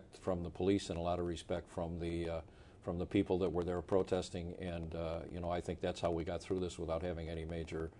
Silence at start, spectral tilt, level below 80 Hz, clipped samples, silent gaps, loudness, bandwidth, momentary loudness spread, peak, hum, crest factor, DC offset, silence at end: 0 s; -6.5 dB/octave; -58 dBFS; under 0.1%; none; -39 LUFS; 11 kHz; 8 LU; -18 dBFS; none; 20 dB; under 0.1%; 0 s